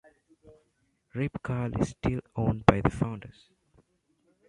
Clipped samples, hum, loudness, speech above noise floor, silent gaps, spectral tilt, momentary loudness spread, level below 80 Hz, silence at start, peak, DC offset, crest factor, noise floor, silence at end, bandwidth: under 0.1%; none; -29 LUFS; 45 dB; none; -7.5 dB/octave; 15 LU; -46 dBFS; 0.45 s; -2 dBFS; under 0.1%; 28 dB; -73 dBFS; 1.2 s; 11 kHz